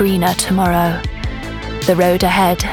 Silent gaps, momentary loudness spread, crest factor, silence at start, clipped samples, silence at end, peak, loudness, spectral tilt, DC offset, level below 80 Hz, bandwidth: none; 12 LU; 14 dB; 0 s; under 0.1%; 0 s; 0 dBFS; -15 LUFS; -5 dB/octave; under 0.1%; -30 dBFS; 20 kHz